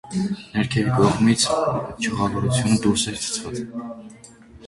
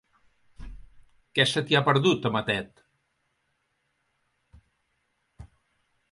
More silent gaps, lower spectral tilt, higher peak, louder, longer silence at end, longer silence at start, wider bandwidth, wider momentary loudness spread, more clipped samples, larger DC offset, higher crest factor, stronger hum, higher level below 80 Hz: neither; about the same, -5 dB/octave vs -5 dB/octave; first, -2 dBFS vs -8 dBFS; first, -21 LUFS vs -24 LUFS; second, 0 s vs 0.65 s; second, 0.05 s vs 0.6 s; about the same, 11.5 kHz vs 11.5 kHz; first, 13 LU vs 9 LU; neither; neither; about the same, 20 dB vs 22 dB; neither; first, -46 dBFS vs -54 dBFS